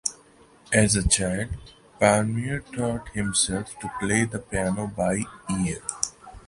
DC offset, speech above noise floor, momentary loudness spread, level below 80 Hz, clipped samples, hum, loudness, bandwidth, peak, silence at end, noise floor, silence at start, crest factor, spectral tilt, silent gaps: under 0.1%; 29 dB; 10 LU; -42 dBFS; under 0.1%; none; -25 LUFS; 11.5 kHz; -4 dBFS; 0.05 s; -54 dBFS; 0.05 s; 22 dB; -4 dB/octave; none